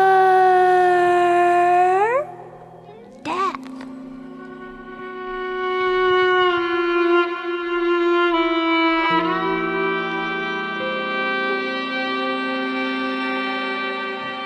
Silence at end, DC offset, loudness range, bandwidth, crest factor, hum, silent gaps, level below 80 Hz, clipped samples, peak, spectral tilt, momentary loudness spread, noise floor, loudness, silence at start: 0 s; under 0.1%; 7 LU; 11 kHz; 14 dB; none; none; -56 dBFS; under 0.1%; -6 dBFS; -5 dB/octave; 18 LU; -41 dBFS; -19 LUFS; 0 s